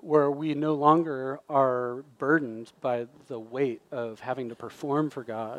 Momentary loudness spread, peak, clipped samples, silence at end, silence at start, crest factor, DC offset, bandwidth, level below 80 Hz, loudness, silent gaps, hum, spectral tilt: 14 LU; -8 dBFS; under 0.1%; 0 s; 0.05 s; 20 dB; under 0.1%; 11 kHz; -78 dBFS; -28 LUFS; none; none; -8 dB/octave